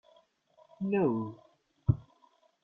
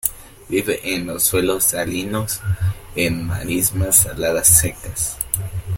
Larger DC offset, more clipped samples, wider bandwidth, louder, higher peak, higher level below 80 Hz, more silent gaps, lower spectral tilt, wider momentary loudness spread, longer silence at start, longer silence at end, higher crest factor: neither; neither; second, 4 kHz vs 17 kHz; second, -33 LUFS vs -18 LUFS; second, -14 dBFS vs 0 dBFS; second, -54 dBFS vs -38 dBFS; neither; first, -11.5 dB/octave vs -3.5 dB/octave; about the same, 9 LU vs 11 LU; first, 0.8 s vs 0.05 s; first, 0.65 s vs 0 s; about the same, 22 dB vs 20 dB